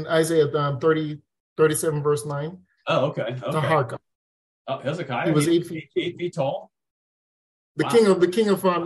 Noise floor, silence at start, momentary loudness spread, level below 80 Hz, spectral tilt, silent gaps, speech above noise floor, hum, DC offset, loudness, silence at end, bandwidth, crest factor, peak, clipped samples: under -90 dBFS; 0 s; 15 LU; -66 dBFS; -5.5 dB/octave; 1.40-1.56 s, 4.15-4.65 s, 6.91-7.75 s; over 68 dB; none; under 0.1%; -23 LUFS; 0 s; 12.5 kHz; 16 dB; -6 dBFS; under 0.1%